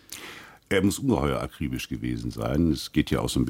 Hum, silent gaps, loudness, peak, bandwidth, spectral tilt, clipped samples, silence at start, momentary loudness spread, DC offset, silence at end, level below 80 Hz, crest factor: none; none; -27 LUFS; -8 dBFS; 16.5 kHz; -5.5 dB/octave; under 0.1%; 0.1 s; 15 LU; under 0.1%; 0 s; -40 dBFS; 18 dB